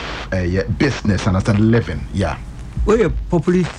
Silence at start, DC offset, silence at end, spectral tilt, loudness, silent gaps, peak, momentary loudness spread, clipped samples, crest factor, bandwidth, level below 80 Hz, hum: 0 s; under 0.1%; 0 s; -7 dB/octave; -18 LUFS; none; -4 dBFS; 8 LU; under 0.1%; 14 dB; 10.5 kHz; -28 dBFS; none